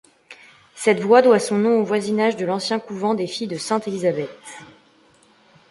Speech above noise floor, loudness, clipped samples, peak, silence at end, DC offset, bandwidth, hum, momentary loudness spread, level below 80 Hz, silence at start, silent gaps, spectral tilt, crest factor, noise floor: 36 dB; -20 LUFS; under 0.1%; -2 dBFS; 1.05 s; under 0.1%; 11.5 kHz; none; 14 LU; -68 dBFS; 0.3 s; none; -5 dB/octave; 20 dB; -55 dBFS